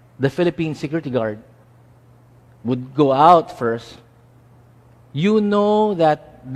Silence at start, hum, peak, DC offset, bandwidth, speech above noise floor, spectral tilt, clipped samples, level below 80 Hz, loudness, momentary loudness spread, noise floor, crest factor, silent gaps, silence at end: 0.2 s; none; 0 dBFS; under 0.1%; 11.5 kHz; 32 dB; -7.5 dB/octave; under 0.1%; -56 dBFS; -18 LUFS; 14 LU; -50 dBFS; 20 dB; none; 0 s